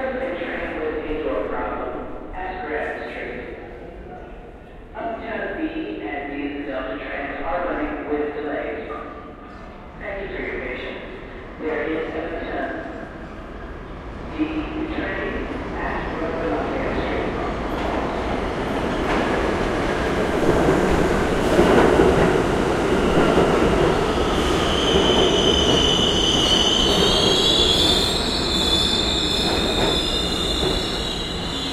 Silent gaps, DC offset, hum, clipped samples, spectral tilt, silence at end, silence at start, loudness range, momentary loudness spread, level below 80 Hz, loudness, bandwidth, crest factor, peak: none; under 0.1%; none; under 0.1%; -4 dB/octave; 0 s; 0 s; 14 LU; 19 LU; -34 dBFS; -21 LUFS; 16 kHz; 20 dB; -2 dBFS